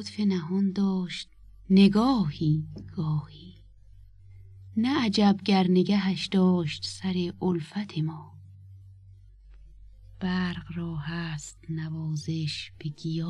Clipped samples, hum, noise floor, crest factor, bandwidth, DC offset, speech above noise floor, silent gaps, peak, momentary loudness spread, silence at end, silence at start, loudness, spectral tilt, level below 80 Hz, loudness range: under 0.1%; none; -51 dBFS; 18 dB; 10 kHz; under 0.1%; 25 dB; none; -8 dBFS; 13 LU; 0 s; 0 s; -27 LUFS; -6.5 dB/octave; -54 dBFS; 10 LU